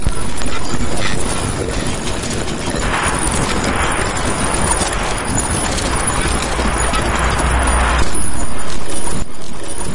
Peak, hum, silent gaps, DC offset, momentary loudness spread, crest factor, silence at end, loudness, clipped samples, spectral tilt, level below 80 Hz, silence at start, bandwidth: -2 dBFS; none; none; under 0.1%; 8 LU; 12 dB; 0 s; -18 LUFS; under 0.1%; -3.5 dB/octave; -24 dBFS; 0 s; 11.5 kHz